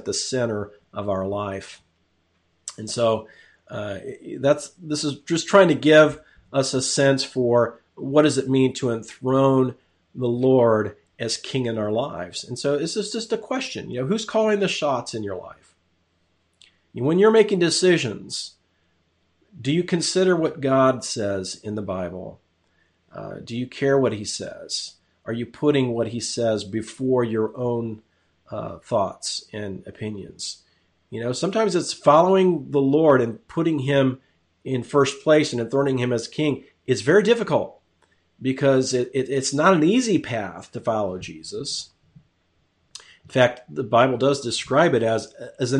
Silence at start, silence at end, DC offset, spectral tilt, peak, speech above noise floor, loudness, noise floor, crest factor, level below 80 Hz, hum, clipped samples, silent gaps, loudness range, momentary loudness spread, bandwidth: 0.05 s; 0 s; under 0.1%; -5 dB/octave; -2 dBFS; 46 dB; -22 LUFS; -67 dBFS; 20 dB; -62 dBFS; none; under 0.1%; none; 8 LU; 16 LU; 11 kHz